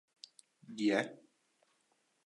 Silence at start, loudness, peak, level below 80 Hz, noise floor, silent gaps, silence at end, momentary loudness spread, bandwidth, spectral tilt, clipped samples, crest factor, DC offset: 0.7 s; -35 LUFS; -18 dBFS; under -90 dBFS; -77 dBFS; none; 1.1 s; 23 LU; 11 kHz; -4.5 dB/octave; under 0.1%; 22 dB; under 0.1%